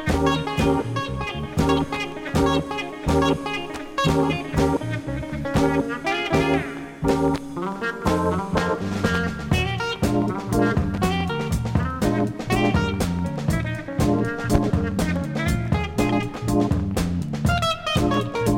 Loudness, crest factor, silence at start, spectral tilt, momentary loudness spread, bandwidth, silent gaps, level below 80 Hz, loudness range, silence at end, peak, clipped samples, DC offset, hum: -23 LUFS; 20 dB; 0 s; -6 dB/octave; 6 LU; 17 kHz; none; -34 dBFS; 1 LU; 0 s; -2 dBFS; under 0.1%; under 0.1%; none